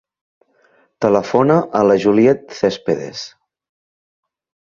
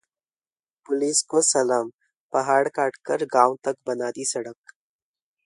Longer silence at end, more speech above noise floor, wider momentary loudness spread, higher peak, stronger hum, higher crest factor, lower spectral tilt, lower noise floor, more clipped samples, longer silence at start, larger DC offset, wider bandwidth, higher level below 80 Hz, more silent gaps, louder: first, 1.45 s vs 0.95 s; second, 42 dB vs over 67 dB; first, 13 LU vs 10 LU; about the same, 0 dBFS vs -2 dBFS; neither; second, 18 dB vs 24 dB; first, -6.5 dB/octave vs -2.5 dB/octave; second, -57 dBFS vs under -90 dBFS; neither; about the same, 1 s vs 0.9 s; neither; second, 7.2 kHz vs 11.5 kHz; first, -56 dBFS vs -76 dBFS; second, none vs 1.94-1.99 s, 2.15-2.30 s; first, -15 LUFS vs -23 LUFS